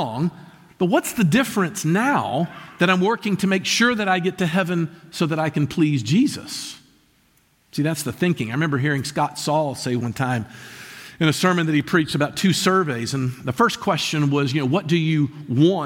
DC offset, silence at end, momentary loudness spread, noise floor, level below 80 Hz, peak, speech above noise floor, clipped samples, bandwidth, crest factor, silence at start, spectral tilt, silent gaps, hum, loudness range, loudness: under 0.1%; 0 s; 8 LU; -60 dBFS; -58 dBFS; -4 dBFS; 40 dB; under 0.1%; 17 kHz; 18 dB; 0 s; -5 dB/octave; none; none; 4 LU; -21 LUFS